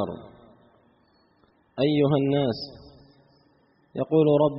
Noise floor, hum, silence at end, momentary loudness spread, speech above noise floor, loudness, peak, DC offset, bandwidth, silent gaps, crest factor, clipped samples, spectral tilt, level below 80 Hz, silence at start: -63 dBFS; none; 0 s; 19 LU; 41 dB; -24 LUFS; -10 dBFS; under 0.1%; 5.8 kHz; none; 18 dB; under 0.1%; -6.5 dB/octave; -62 dBFS; 0 s